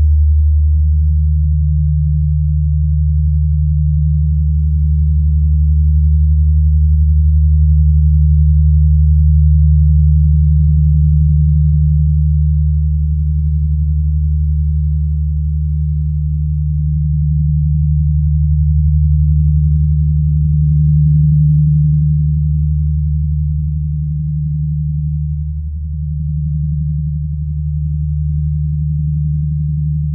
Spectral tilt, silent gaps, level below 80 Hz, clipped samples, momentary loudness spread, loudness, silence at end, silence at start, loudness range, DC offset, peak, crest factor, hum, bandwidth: -30.5 dB/octave; none; -14 dBFS; under 0.1%; 7 LU; -14 LUFS; 0 s; 0 s; 7 LU; under 0.1%; -2 dBFS; 10 dB; none; 0.3 kHz